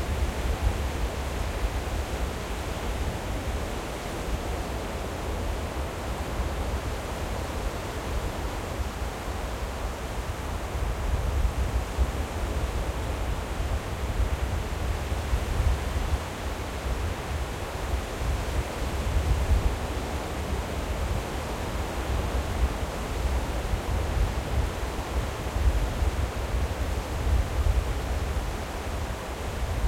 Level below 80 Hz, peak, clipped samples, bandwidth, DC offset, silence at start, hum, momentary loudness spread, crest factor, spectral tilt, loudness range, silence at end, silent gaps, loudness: -30 dBFS; -12 dBFS; under 0.1%; 16.5 kHz; under 0.1%; 0 s; none; 5 LU; 16 dB; -5.5 dB/octave; 3 LU; 0 s; none; -31 LUFS